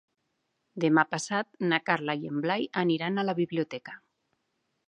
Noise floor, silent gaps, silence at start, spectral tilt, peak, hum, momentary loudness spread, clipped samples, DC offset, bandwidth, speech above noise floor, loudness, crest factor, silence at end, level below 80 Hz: -78 dBFS; none; 0.75 s; -5 dB/octave; -8 dBFS; none; 13 LU; under 0.1%; under 0.1%; 11 kHz; 50 dB; -28 LUFS; 22 dB; 0.9 s; -80 dBFS